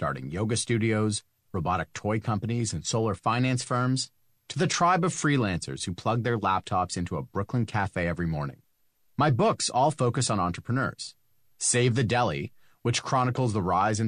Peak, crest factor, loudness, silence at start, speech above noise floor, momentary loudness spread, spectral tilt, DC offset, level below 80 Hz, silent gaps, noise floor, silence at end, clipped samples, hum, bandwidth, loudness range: -10 dBFS; 16 dB; -27 LUFS; 0 s; 41 dB; 9 LU; -5 dB/octave; under 0.1%; -54 dBFS; none; -67 dBFS; 0 s; under 0.1%; none; 10.5 kHz; 2 LU